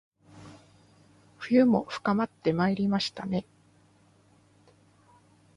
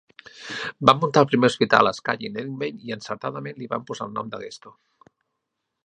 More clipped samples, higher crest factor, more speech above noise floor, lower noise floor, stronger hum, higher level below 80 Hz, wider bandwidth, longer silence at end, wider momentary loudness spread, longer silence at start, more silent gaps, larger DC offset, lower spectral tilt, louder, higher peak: neither; about the same, 20 dB vs 24 dB; second, 36 dB vs 57 dB; second, -62 dBFS vs -80 dBFS; neither; about the same, -66 dBFS vs -64 dBFS; about the same, 11 kHz vs 10 kHz; first, 2.15 s vs 1.15 s; about the same, 17 LU vs 16 LU; about the same, 0.35 s vs 0.35 s; neither; neither; about the same, -6.5 dB/octave vs -5.5 dB/octave; second, -27 LUFS vs -22 LUFS; second, -10 dBFS vs 0 dBFS